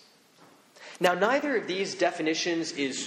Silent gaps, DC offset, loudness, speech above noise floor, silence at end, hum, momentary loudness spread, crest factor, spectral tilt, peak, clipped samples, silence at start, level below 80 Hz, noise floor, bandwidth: none; under 0.1%; -27 LUFS; 30 dB; 0 s; none; 6 LU; 20 dB; -3 dB/octave; -8 dBFS; under 0.1%; 0.8 s; -76 dBFS; -57 dBFS; 16 kHz